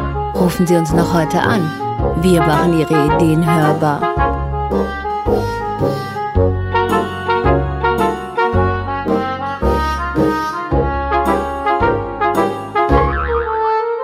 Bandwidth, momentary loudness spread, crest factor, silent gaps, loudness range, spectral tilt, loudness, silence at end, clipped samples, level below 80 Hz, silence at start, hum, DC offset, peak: 16 kHz; 6 LU; 14 dB; none; 3 LU; -7 dB/octave; -16 LUFS; 0 s; under 0.1%; -26 dBFS; 0 s; none; under 0.1%; 0 dBFS